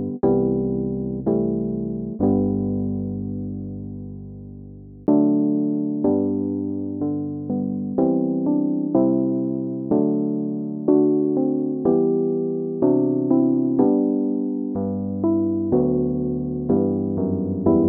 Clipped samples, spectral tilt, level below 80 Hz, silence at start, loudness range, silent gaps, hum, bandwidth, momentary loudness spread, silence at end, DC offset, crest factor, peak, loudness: under 0.1%; -15 dB/octave; -48 dBFS; 0 s; 4 LU; none; none; 1.8 kHz; 9 LU; 0 s; under 0.1%; 16 dB; -6 dBFS; -22 LUFS